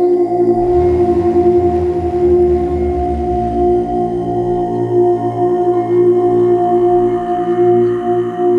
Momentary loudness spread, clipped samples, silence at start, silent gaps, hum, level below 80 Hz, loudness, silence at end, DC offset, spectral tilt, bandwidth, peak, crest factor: 5 LU; under 0.1%; 0 s; none; none; -30 dBFS; -13 LUFS; 0 s; under 0.1%; -10 dB/octave; 3.3 kHz; -2 dBFS; 10 dB